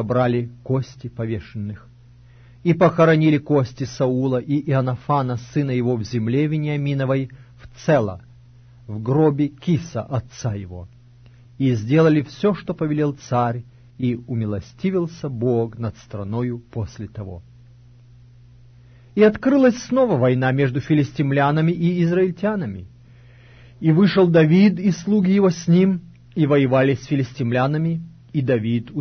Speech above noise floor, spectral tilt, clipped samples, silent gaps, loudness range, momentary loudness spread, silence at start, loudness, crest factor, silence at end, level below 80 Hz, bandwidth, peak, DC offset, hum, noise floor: 28 dB; -8 dB/octave; under 0.1%; none; 7 LU; 14 LU; 0 s; -20 LUFS; 16 dB; 0 s; -52 dBFS; 6.6 kHz; -4 dBFS; under 0.1%; none; -47 dBFS